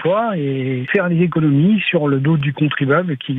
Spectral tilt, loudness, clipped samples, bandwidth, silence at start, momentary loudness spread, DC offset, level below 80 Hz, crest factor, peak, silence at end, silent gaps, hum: -10 dB/octave; -16 LUFS; under 0.1%; 4 kHz; 0 s; 5 LU; under 0.1%; -60 dBFS; 14 dB; -2 dBFS; 0 s; none; none